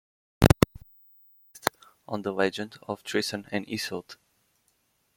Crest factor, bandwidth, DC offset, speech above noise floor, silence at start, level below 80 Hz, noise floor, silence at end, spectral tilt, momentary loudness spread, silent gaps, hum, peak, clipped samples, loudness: 28 dB; 16.5 kHz; under 0.1%; 40 dB; 0.4 s; -44 dBFS; -71 dBFS; 1.05 s; -5.5 dB/octave; 15 LU; none; none; 0 dBFS; under 0.1%; -28 LUFS